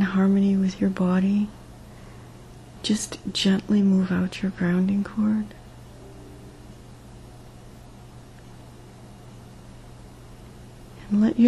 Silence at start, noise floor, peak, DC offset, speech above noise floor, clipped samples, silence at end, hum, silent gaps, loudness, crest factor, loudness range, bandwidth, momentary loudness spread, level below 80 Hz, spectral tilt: 0 s; -44 dBFS; -8 dBFS; under 0.1%; 23 dB; under 0.1%; 0 s; none; none; -23 LUFS; 18 dB; 22 LU; 12 kHz; 25 LU; -50 dBFS; -6 dB/octave